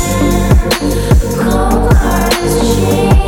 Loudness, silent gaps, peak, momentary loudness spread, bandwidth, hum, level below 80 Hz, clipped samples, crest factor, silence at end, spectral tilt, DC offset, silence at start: -11 LUFS; none; 0 dBFS; 2 LU; 18 kHz; 50 Hz at -20 dBFS; -14 dBFS; under 0.1%; 10 dB; 0 s; -5.5 dB/octave; under 0.1%; 0 s